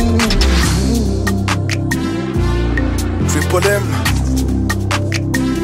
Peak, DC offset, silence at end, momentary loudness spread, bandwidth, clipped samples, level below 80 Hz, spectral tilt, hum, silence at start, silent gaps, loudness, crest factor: -2 dBFS; under 0.1%; 0 s; 4 LU; 16.5 kHz; under 0.1%; -20 dBFS; -5 dB/octave; none; 0 s; none; -16 LUFS; 14 dB